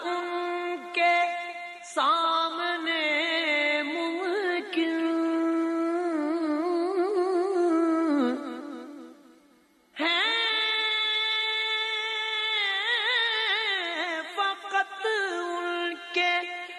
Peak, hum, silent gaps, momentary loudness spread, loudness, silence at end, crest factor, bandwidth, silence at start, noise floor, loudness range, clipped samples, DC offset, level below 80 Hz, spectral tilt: -12 dBFS; none; none; 7 LU; -26 LUFS; 0 s; 16 dB; 11 kHz; 0 s; -61 dBFS; 3 LU; under 0.1%; under 0.1%; -86 dBFS; -1.5 dB/octave